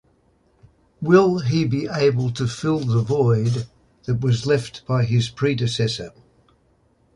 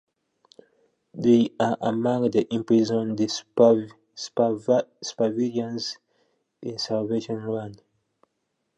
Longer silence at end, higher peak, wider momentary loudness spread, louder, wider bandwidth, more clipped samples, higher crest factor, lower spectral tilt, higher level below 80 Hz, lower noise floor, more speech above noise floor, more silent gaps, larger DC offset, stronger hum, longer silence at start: about the same, 1.05 s vs 1 s; about the same, -2 dBFS vs -4 dBFS; second, 11 LU vs 15 LU; first, -21 LUFS vs -24 LUFS; first, 11 kHz vs 8.4 kHz; neither; about the same, 18 dB vs 20 dB; about the same, -6.5 dB/octave vs -6 dB/octave; first, -50 dBFS vs -68 dBFS; second, -61 dBFS vs -77 dBFS; second, 41 dB vs 54 dB; neither; neither; neither; second, 1 s vs 1.15 s